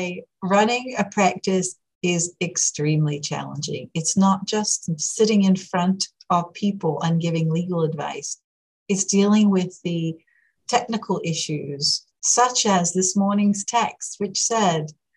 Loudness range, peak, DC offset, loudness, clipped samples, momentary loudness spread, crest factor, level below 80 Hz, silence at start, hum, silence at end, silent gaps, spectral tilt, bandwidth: 3 LU; -4 dBFS; under 0.1%; -22 LUFS; under 0.1%; 10 LU; 18 dB; -68 dBFS; 0 s; none; 0.25 s; 1.95-2.01 s, 8.44-8.86 s; -4 dB/octave; 11.5 kHz